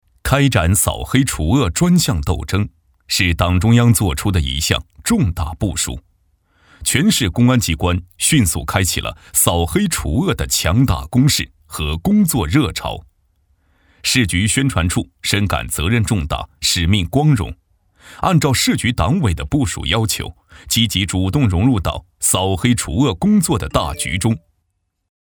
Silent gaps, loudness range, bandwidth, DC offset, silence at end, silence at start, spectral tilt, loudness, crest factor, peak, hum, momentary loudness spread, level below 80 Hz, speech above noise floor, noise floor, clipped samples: none; 2 LU; over 20 kHz; under 0.1%; 0.9 s; 0.25 s; -4.5 dB/octave; -16 LUFS; 16 dB; 0 dBFS; none; 7 LU; -32 dBFS; 54 dB; -70 dBFS; under 0.1%